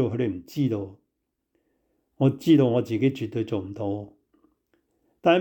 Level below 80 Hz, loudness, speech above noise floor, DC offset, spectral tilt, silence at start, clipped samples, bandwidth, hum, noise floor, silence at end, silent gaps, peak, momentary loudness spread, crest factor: -68 dBFS; -25 LUFS; 55 dB; under 0.1%; -8 dB/octave; 0 s; under 0.1%; 18.5 kHz; none; -79 dBFS; 0 s; none; -8 dBFS; 13 LU; 18 dB